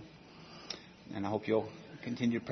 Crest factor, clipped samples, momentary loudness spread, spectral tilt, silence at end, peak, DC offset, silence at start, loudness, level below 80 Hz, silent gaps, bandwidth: 20 dB; under 0.1%; 19 LU; -5 dB/octave; 0 s; -18 dBFS; under 0.1%; 0 s; -37 LUFS; -72 dBFS; none; 6.2 kHz